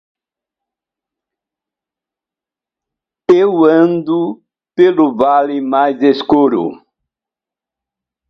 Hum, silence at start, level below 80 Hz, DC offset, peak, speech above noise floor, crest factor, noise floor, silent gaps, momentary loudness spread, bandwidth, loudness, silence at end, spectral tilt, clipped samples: none; 3.3 s; -58 dBFS; under 0.1%; 0 dBFS; 76 dB; 16 dB; -88 dBFS; none; 10 LU; 6.2 kHz; -12 LUFS; 1.55 s; -8 dB/octave; under 0.1%